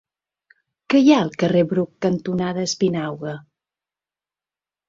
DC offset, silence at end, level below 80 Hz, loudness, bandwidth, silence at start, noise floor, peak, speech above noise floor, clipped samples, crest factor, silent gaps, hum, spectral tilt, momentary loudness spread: under 0.1%; 1.5 s; -60 dBFS; -19 LUFS; 7.8 kHz; 0.9 s; under -90 dBFS; -2 dBFS; over 71 dB; under 0.1%; 20 dB; none; 50 Hz at -50 dBFS; -6 dB/octave; 14 LU